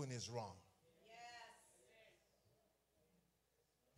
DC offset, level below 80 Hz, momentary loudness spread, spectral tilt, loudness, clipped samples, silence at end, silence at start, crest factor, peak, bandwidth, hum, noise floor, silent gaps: under 0.1%; -88 dBFS; 21 LU; -4 dB/octave; -53 LUFS; under 0.1%; 1.8 s; 0 s; 22 dB; -34 dBFS; 15.5 kHz; none; -83 dBFS; none